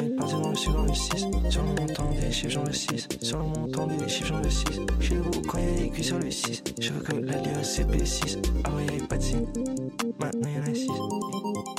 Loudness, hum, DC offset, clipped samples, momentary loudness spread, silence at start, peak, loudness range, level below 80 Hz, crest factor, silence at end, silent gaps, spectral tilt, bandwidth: -29 LUFS; none; under 0.1%; under 0.1%; 4 LU; 0 s; -12 dBFS; 1 LU; -32 dBFS; 14 dB; 0 s; none; -4.5 dB/octave; 15.5 kHz